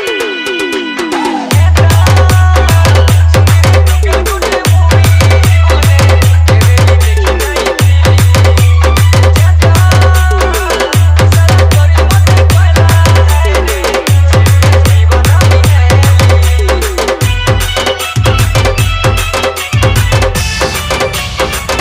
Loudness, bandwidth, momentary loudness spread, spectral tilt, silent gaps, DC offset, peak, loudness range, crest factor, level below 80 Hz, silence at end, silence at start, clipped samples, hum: -8 LUFS; 16 kHz; 6 LU; -5 dB/octave; none; under 0.1%; 0 dBFS; 3 LU; 6 dB; -16 dBFS; 0 s; 0 s; 0.3%; none